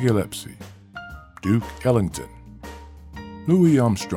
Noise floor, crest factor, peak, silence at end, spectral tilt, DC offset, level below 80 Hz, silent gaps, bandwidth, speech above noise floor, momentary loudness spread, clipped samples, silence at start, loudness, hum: -40 dBFS; 16 dB; -6 dBFS; 0 s; -7 dB/octave; under 0.1%; -44 dBFS; none; 17 kHz; 19 dB; 24 LU; under 0.1%; 0 s; -21 LUFS; none